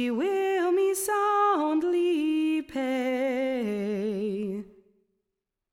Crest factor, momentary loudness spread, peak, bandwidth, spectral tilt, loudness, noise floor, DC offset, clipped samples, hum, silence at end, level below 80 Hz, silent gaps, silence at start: 12 dB; 7 LU; -16 dBFS; 16.5 kHz; -4.5 dB/octave; -27 LUFS; -85 dBFS; under 0.1%; under 0.1%; none; 1.1 s; -68 dBFS; none; 0 s